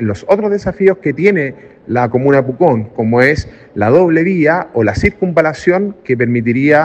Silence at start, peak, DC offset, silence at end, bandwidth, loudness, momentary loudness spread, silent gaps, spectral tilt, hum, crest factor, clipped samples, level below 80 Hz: 0 s; 0 dBFS; under 0.1%; 0 s; 8.6 kHz; -13 LUFS; 6 LU; none; -8 dB/octave; none; 12 dB; under 0.1%; -36 dBFS